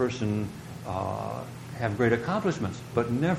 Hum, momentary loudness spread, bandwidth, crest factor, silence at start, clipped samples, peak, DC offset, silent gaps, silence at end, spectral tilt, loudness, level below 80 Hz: none; 12 LU; 15 kHz; 20 dB; 0 s; under 0.1%; -8 dBFS; under 0.1%; none; 0 s; -7 dB/octave; -29 LUFS; -56 dBFS